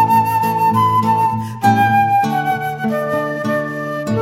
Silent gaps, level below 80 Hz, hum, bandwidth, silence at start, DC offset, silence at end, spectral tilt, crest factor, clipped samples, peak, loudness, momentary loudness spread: none; -52 dBFS; none; 16.5 kHz; 0 s; under 0.1%; 0 s; -6.5 dB/octave; 14 dB; under 0.1%; 0 dBFS; -16 LUFS; 7 LU